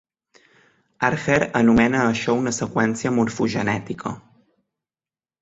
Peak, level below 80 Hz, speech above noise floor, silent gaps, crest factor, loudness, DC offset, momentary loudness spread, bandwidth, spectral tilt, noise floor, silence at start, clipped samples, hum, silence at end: -2 dBFS; -50 dBFS; over 70 dB; none; 20 dB; -21 LUFS; under 0.1%; 12 LU; 8 kHz; -5.5 dB/octave; under -90 dBFS; 1 s; under 0.1%; none; 1.2 s